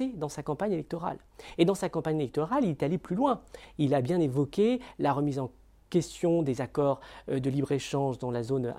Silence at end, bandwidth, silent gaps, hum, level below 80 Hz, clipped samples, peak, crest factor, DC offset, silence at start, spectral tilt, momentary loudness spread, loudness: 0 s; 15 kHz; none; none; -58 dBFS; under 0.1%; -10 dBFS; 18 dB; under 0.1%; 0 s; -7 dB/octave; 9 LU; -30 LUFS